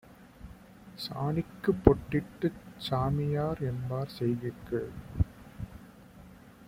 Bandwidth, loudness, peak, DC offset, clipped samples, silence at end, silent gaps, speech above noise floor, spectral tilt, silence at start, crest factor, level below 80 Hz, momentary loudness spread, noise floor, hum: 16 kHz; -32 LUFS; -2 dBFS; under 0.1%; under 0.1%; 0 s; none; 22 dB; -8 dB/octave; 0.1 s; 30 dB; -44 dBFS; 26 LU; -52 dBFS; none